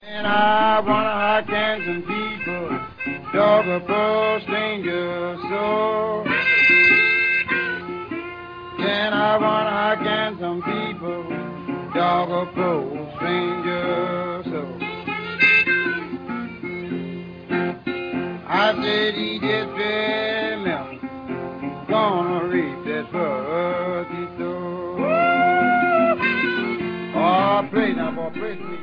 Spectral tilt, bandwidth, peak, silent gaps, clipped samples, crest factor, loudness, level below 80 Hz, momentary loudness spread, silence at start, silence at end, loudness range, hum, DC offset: -7 dB/octave; 5.2 kHz; -4 dBFS; none; under 0.1%; 18 dB; -21 LUFS; -56 dBFS; 13 LU; 0 s; 0 s; 7 LU; none; under 0.1%